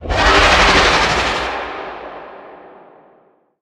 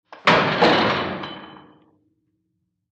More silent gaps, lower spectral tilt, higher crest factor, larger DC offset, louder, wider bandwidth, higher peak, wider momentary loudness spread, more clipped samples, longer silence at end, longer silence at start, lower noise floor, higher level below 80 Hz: neither; second, -3 dB/octave vs -5 dB/octave; about the same, 16 dB vs 20 dB; neither; first, -12 LUFS vs -18 LUFS; first, 14 kHz vs 9.2 kHz; first, 0 dBFS vs -4 dBFS; first, 22 LU vs 17 LU; neither; second, 1.05 s vs 1.45 s; second, 0 s vs 0.25 s; second, -54 dBFS vs -74 dBFS; first, -28 dBFS vs -56 dBFS